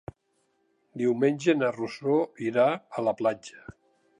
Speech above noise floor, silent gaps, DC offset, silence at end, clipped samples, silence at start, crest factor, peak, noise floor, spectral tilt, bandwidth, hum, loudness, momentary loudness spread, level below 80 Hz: 46 dB; none; under 0.1%; 0.5 s; under 0.1%; 0.95 s; 18 dB; -10 dBFS; -73 dBFS; -6.5 dB/octave; 10.5 kHz; none; -27 LUFS; 16 LU; -66 dBFS